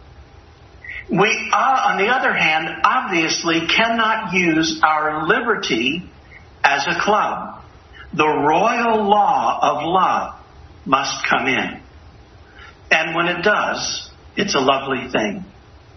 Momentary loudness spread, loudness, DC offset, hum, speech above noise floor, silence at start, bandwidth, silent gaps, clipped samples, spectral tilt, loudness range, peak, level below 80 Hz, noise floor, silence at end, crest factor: 12 LU; -17 LUFS; under 0.1%; none; 27 dB; 0 s; 6.4 kHz; none; under 0.1%; -3.5 dB/octave; 4 LU; 0 dBFS; -50 dBFS; -45 dBFS; 0.45 s; 20 dB